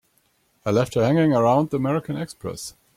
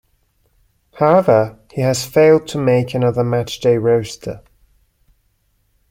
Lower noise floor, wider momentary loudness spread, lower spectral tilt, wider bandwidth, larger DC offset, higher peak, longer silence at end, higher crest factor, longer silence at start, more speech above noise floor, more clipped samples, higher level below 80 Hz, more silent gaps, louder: about the same, -65 dBFS vs -62 dBFS; about the same, 14 LU vs 13 LU; about the same, -7 dB/octave vs -6 dB/octave; about the same, 16 kHz vs 16.5 kHz; neither; second, -6 dBFS vs -2 dBFS; second, 0.25 s vs 1.5 s; about the same, 16 dB vs 16 dB; second, 0.65 s vs 0.95 s; about the same, 44 dB vs 47 dB; neither; second, -56 dBFS vs -50 dBFS; neither; second, -22 LUFS vs -16 LUFS